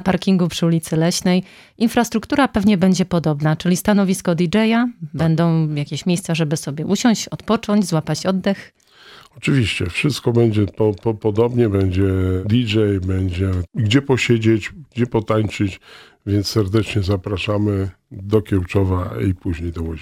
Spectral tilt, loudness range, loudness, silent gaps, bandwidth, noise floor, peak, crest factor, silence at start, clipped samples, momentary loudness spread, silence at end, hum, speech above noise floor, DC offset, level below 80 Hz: -6 dB/octave; 3 LU; -19 LUFS; none; 16 kHz; -45 dBFS; -2 dBFS; 16 dB; 0 s; under 0.1%; 6 LU; 0 s; none; 27 dB; under 0.1%; -42 dBFS